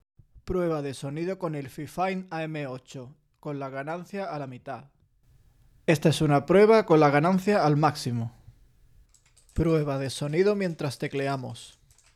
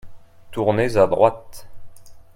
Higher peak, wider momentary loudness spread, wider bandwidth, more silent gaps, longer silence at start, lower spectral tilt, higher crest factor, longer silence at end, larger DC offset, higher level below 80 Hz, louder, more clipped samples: second, -8 dBFS vs 0 dBFS; about the same, 18 LU vs 16 LU; second, 14.5 kHz vs 16 kHz; neither; first, 0.35 s vs 0.05 s; about the same, -6.5 dB/octave vs -6.5 dB/octave; about the same, 18 dB vs 20 dB; first, 0.45 s vs 0.15 s; neither; second, -52 dBFS vs -46 dBFS; second, -26 LUFS vs -19 LUFS; neither